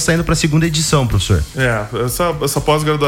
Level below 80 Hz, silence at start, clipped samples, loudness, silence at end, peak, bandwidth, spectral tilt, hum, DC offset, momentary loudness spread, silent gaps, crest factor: -28 dBFS; 0 s; under 0.1%; -15 LUFS; 0 s; -2 dBFS; 17 kHz; -4.5 dB/octave; none; under 0.1%; 3 LU; none; 14 dB